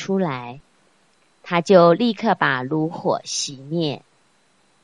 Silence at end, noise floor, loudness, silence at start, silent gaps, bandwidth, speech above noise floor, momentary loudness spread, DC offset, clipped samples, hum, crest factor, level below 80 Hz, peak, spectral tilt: 0.85 s; -61 dBFS; -20 LUFS; 0 s; none; 11 kHz; 42 dB; 13 LU; under 0.1%; under 0.1%; none; 20 dB; -66 dBFS; 0 dBFS; -5 dB/octave